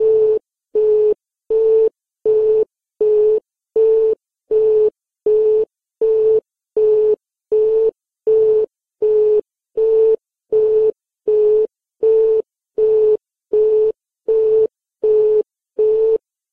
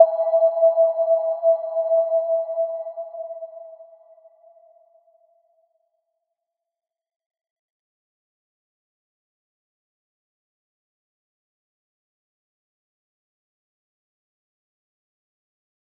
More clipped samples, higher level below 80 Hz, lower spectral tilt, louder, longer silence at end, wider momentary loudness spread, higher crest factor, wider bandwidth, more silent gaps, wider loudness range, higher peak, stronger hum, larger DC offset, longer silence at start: neither; first, -54 dBFS vs under -90 dBFS; first, -8.5 dB/octave vs -5.5 dB/octave; first, -17 LUFS vs -20 LUFS; second, 0.35 s vs 12.15 s; second, 9 LU vs 17 LU; second, 8 dB vs 26 dB; first, 2.9 kHz vs 2.1 kHz; neither; second, 0 LU vs 21 LU; second, -8 dBFS vs -2 dBFS; neither; neither; about the same, 0 s vs 0 s